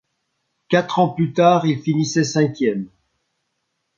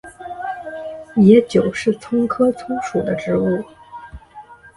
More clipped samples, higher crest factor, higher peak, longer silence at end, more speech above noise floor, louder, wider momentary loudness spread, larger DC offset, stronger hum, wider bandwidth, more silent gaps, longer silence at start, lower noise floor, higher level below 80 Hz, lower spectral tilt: neither; about the same, 18 dB vs 18 dB; about the same, -2 dBFS vs 0 dBFS; first, 1.1 s vs 0.1 s; first, 56 dB vs 25 dB; about the same, -18 LUFS vs -18 LUFS; second, 7 LU vs 24 LU; neither; neither; second, 7.6 kHz vs 11.5 kHz; neither; first, 0.7 s vs 0.05 s; first, -74 dBFS vs -41 dBFS; second, -64 dBFS vs -50 dBFS; second, -6 dB/octave vs -7.5 dB/octave